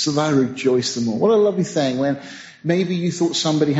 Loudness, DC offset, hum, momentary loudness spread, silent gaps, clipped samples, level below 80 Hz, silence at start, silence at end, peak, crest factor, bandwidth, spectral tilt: -19 LUFS; under 0.1%; none; 6 LU; none; under 0.1%; -62 dBFS; 0 s; 0 s; -4 dBFS; 14 dB; 8 kHz; -5.5 dB/octave